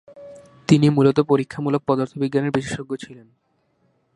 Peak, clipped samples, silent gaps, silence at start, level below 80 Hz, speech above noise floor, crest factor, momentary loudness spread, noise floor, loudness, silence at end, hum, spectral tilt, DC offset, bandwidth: -2 dBFS; under 0.1%; none; 0.15 s; -58 dBFS; 46 dB; 20 dB; 16 LU; -65 dBFS; -20 LUFS; 1 s; none; -7 dB/octave; under 0.1%; 11.5 kHz